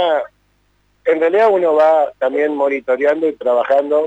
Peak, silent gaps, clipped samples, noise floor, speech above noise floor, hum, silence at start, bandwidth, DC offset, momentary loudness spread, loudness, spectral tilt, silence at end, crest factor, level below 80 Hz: -6 dBFS; none; under 0.1%; -59 dBFS; 45 dB; 50 Hz at -60 dBFS; 0 s; 7.8 kHz; under 0.1%; 6 LU; -15 LUFS; -5.5 dB/octave; 0 s; 10 dB; -62 dBFS